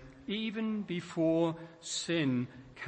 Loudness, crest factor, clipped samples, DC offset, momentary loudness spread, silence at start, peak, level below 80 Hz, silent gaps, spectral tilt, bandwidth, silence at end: -34 LUFS; 16 dB; under 0.1%; under 0.1%; 9 LU; 0 s; -18 dBFS; -68 dBFS; none; -5 dB/octave; 8.8 kHz; 0 s